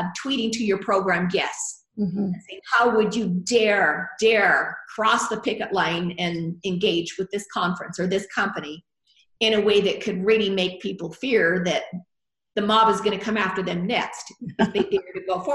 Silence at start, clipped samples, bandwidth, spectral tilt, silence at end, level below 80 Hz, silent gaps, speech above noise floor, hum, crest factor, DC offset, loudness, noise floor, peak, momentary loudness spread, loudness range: 0 s; under 0.1%; 12 kHz; -4.5 dB/octave; 0 s; -62 dBFS; none; 40 dB; none; 16 dB; under 0.1%; -23 LUFS; -63 dBFS; -6 dBFS; 11 LU; 4 LU